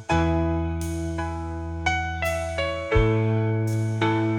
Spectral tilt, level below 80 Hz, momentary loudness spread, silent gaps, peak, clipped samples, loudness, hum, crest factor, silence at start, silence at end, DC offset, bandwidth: -6.5 dB/octave; -36 dBFS; 7 LU; none; -8 dBFS; under 0.1%; -25 LUFS; none; 16 dB; 0 s; 0 s; under 0.1%; 17.5 kHz